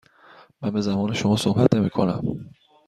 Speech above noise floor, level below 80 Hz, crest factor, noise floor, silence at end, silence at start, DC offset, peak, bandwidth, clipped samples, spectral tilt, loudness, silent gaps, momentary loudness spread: 30 dB; -54 dBFS; 22 dB; -51 dBFS; 0.4 s; 0.6 s; under 0.1%; -2 dBFS; 13 kHz; under 0.1%; -6.5 dB/octave; -22 LUFS; none; 11 LU